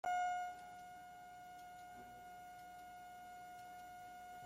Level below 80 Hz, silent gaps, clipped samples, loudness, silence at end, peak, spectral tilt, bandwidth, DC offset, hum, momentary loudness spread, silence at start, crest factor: -78 dBFS; none; under 0.1%; -50 LUFS; 0 s; -32 dBFS; -2.5 dB/octave; 16.5 kHz; under 0.1%; none; 14 LU; 0.05 s; 16 dB